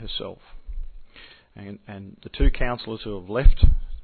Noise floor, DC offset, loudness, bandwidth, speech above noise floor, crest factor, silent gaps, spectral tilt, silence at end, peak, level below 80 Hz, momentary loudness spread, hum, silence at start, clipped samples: -49 dBFS; under 0.1%; -25 LUFS; 4.5 kHz; 29 dB; 22 dB; none; -10.5 dB/octave; 0 s; 0 dBFS; -24 dBFS; 24 LU; none; 0 s; under 0.1%